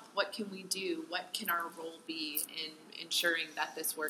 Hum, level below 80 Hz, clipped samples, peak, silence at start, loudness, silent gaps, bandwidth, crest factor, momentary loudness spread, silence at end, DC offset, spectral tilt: none; under -90 dBFS; under 0.1%; -16 dBFS; 0 s; -36 LUFS; none; 16 kHz; 22 dB; 11 LU; 0 s; under 0.1%; -1 dB/octave